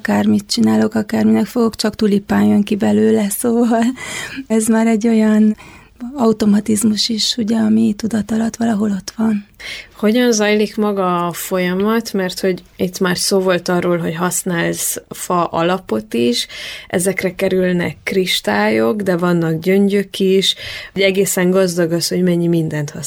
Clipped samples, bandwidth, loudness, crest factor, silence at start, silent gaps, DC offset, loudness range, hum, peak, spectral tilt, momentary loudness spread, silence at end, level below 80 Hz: under 0.1%; 17.5 kHz; -16 LUFS; 14 dB; 0.05 s; none; under 0.1%; 3 LU; none; -2 dBFS; -4.5 dB/octave; 7 LU; 0 s; -50 dBFS